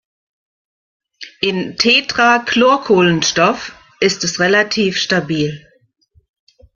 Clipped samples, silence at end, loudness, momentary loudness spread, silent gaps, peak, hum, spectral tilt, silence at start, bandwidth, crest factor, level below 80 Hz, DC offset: under 0.1%; 1.15 s; -14 LUFS; 12 LU; none; 0 dBFS; none; -3.5 dB/octave; 1.2 s; 7.4 kHz; 16 dB; -54 dBFS; under 0.1%